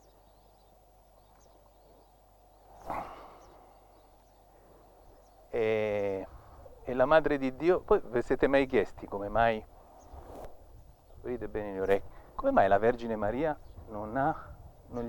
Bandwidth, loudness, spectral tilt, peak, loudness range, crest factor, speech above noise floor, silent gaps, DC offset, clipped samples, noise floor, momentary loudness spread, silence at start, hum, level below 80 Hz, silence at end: 18.5 kHz; -30 LUFS; -7 dB/octave; -10 dBFS; 19 LU; 22 dB; 32 dB; none; under 0.1%; under 0.1%; -60 dBFS; 23 LU; 2.75 s; none; -50 dBFS; 0 s